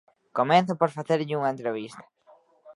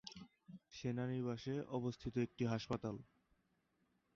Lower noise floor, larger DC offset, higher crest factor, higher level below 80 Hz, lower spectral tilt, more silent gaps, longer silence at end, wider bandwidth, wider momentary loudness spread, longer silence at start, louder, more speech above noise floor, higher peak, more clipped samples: second, -59 dBFS vs -81 dBFS; neither; about the same, 20 dB vs 16 dB; second, -76 dBFS vs -70 dBFS; about the same, -6.5 dB/octave vs -6.5 dB/octave; neither; second, 0.05 s vs 1.1 s; first, 11.5 kHz vs 7.4 kHz; second, 13 LU vs 16 LU; first, 0.35 s vs 0.05 s; first, -26 LUFS vs -43 LUFS; second, 34 dB vs 39 dB; first, -6 dBFS vs -28 dBFS; neither